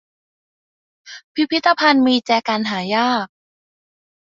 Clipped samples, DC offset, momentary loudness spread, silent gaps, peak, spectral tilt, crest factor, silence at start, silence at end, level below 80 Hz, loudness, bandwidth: under 0.1%; under 0.1%; 9 LU; 1.24-1.35 s; -2 dBFS; -4.5 dB/octave; 18 dB; 1.05 s; 0.95 s; -66 dBFS; -17 LUFS; 7.6 kHz